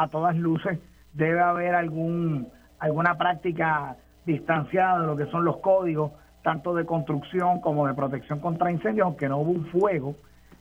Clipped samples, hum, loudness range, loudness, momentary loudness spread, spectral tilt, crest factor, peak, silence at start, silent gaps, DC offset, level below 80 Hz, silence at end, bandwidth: under 0.1%; none; 1 LU; -26 LUFS; 8 LU; -9 dB/octave; 18 dB; -8 dBFS; 0 s; none; under 0.1%; -58 dBFS; 0.45 s; 7 kHz